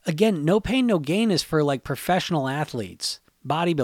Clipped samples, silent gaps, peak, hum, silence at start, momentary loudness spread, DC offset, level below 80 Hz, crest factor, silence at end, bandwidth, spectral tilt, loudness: under 0.1%; none; -8 dBFS; none; 0.05 s; 8 LU; under 0.1%; -50 dBFS; 16 dB; 0 s; 17 kHz; -5.5 dB/octave; -23 LUFS